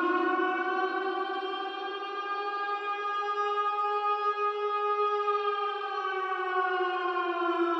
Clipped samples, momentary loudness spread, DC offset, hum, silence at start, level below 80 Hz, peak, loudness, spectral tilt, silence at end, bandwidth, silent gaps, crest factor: under 0.1%; 5 LU; under 0.1%; none; 0 s; under -90 dBFS; -16 dBFS; -30 LUFS; -2 dB/octave; 0 s; 7.8 kHz; none; 14 dB